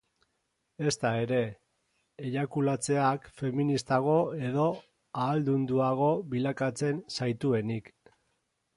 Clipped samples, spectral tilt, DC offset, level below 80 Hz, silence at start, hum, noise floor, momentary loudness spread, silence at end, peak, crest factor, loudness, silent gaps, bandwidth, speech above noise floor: under 0.1%; -6 dB/octave; under 0.1%; -68 dBFS; 0.8 s; none; -79 dBFS; 7 LU; 0.9 s; -12 dBFS; 18 dB; -30 LUFS; none; 11.5 kHz; 50 dB